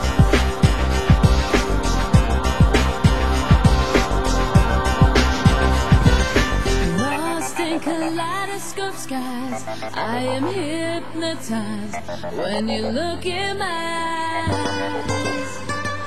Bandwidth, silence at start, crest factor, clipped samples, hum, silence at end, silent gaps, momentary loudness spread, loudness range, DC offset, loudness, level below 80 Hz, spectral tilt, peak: 16 kHz; 0 s; 18 dB; under 0.1%; none; 0 s; none; 10 LU; 8 LU; 3%; -20 LUFS; -24 dBFS; -5.5 dB/octave; -2 dBFS